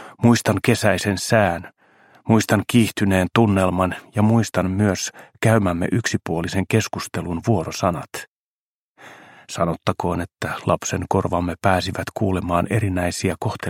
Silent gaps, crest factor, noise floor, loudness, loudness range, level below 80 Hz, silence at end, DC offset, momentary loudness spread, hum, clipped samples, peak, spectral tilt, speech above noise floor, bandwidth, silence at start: 8.28-8.95 s; 20 dB; under -90 dBFS; -20 LUFS; 6 LU; -48 dBFS; 0 s; under 0.1%; 8 LU; none; under 0.1%; 0 dBFS; -5.5 dB/octave; over 70 dB; 16.5 kHz; 0 s